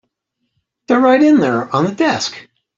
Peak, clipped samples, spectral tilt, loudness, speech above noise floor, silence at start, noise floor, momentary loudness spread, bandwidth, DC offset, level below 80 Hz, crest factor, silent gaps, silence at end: -2 dBFS; under 0.1%; -5 dB/octave; -14 LUFS; 59 dB; 0.9 s; -72 dBFS; 8 LU; 7.6 kHz; under 0.1%; -60 dBFS; 14 dB; none; 0.35 s